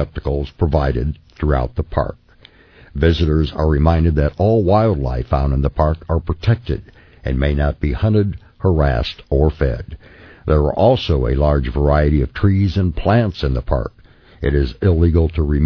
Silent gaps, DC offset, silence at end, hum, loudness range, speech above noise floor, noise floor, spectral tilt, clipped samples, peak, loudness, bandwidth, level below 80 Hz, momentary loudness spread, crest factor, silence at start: none; under 0.1%; 0 s; none; 3 LU; 31 dB; -47 dBFS; -9.5 dB/octave; under 0.1%; -2 dBFS; -18 LUFS; 5.4 kHz; -22 dBFS; 8 LU; 16 dB; 0 s